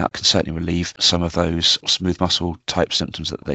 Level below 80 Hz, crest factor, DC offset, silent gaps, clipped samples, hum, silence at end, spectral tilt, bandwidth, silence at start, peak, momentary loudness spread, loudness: -44 dBFS; 18 dB; under 0.1%; none; under 0.1%; none; 0 s; -3.5 dB/octave; 8.4 kHz; 0 s; -2 dBFS; 7 LU; -19 LUFS